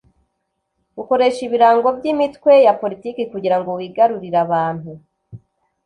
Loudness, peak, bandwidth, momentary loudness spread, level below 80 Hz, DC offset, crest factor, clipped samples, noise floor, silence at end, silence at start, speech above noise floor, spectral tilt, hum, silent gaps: -16 LUFS; -2 dBFS; 10.5 kHz; 14 LU; -60 dBFS; under 0.1%; 16 dB; under 0.1%; -73 dBFS; 0.5 s; 0.95 s; 57 dB; -6.5 dB/octave; none; none